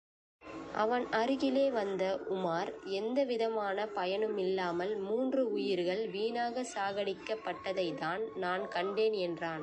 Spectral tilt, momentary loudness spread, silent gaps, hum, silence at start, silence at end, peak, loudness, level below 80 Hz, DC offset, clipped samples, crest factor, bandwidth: -5 dB/octave; 6 LU; none; none; 0.4 s; 0 s; -18 dBFS; -34 LUFS; -72 dBFS; under 0.1%; under 0.1%; 16 dB; 9.4 kHz